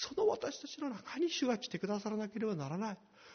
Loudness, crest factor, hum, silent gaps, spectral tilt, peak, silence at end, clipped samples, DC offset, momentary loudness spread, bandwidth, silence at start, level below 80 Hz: -38 LUFS; 16 dB; none; none; -4.5 dB/octave; -22 dBFS; 0 s; under 0.1%; under 0.1%; 8 LU; 6.6 kHz; 0 s; -76 dBFS